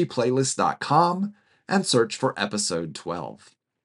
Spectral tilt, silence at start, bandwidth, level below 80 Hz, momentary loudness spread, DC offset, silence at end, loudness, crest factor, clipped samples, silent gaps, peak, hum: -4 dB/octave; 0 s; 11.5 kHz; -68 dBFS; 12 LU; under 0.1%; 0.5 s; -24 LUFS; 20 dB; under 0.1%; none; -4 dBFS; none